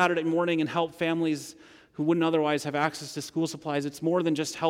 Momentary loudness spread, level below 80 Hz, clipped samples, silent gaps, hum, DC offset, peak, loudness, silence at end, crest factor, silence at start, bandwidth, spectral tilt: 9 LU; -72 dBFS; under 0.1%; none; none; under 0.1%; -10 dBFS; -28 LUFS; 0 s; 18 dB; 0 s; 15.5 kHz; -5 dB/octave